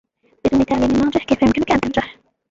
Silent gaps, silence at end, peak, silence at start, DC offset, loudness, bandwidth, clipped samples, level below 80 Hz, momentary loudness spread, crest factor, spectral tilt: none; 0.4 s; -2 dBFS; 0.45 s; under 0.1%; -17 LUFS; 7.8 kHz; under 0.1%; -38 dBFS; 7 LU; 16 dB; -6 dB/octave